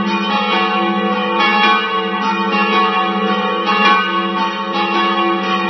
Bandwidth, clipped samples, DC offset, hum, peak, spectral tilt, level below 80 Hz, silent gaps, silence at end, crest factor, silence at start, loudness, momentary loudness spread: 6.2 kHz; under 0.1%; under 0.1%; none; 0 dBFS; -5 dB/octave; -70 dBFS; none; 0 s; 14 dB; 0 s; -14 LUFS; 5 LU